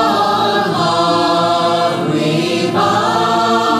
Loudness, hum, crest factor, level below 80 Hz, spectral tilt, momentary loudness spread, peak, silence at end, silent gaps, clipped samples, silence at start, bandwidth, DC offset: -14 LUFS; none; 12 dB; -52 dBFS; -5 dB/octave; 2 LU; -2 dBFS; 0 s; none; under 0.1%; 0 s; 15 kHz; under 0.1%